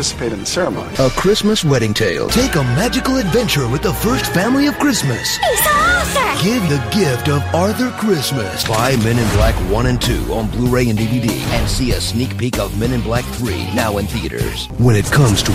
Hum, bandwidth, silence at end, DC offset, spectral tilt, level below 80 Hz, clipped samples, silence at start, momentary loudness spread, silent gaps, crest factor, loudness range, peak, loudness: none; 16 kHz; 0 s; under 0.1%; -4.5 dB/octave; -28 dBFS; under 0.1%; 0 s; 6 LU; none; 14 dB; 3 LU; -2 dBFS; -16 LUFS